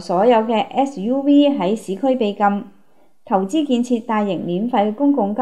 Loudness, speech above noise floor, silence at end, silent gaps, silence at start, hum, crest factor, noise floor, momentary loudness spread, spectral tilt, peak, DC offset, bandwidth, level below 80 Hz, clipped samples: -18 LUFS; 40 dB; 0 s; none; 0 s; none; 16 dB; -58 dBFS; 7 LU; -6.5 dB/octave; -2 dBFS; 0.4%; 11.5 kHz; -72 dBFS; under 0.1%